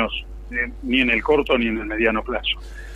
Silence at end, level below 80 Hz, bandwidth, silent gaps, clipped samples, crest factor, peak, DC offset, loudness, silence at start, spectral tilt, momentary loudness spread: 0 s; -36 dBFS; 12.5 kHz; none; under 0.1%; 18 dB; -4 dBFS; under 0.1%; -21 LUFS; 0 s; -6 dB/octave; 9 LU